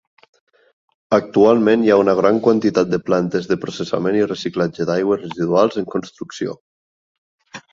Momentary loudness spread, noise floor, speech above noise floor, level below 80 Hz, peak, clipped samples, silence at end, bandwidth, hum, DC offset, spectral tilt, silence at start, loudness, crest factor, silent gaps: 13 LU; under -90 dBFS; over 73 dB; -58 dBFS; -2 dBFS; under 0.1%; 0.15 s; 7.6 kHz; none; under 0.1%; -6.5 dB/octave; 1.1 s; -17 LUFS; 16 dB; 6.61-7.38 s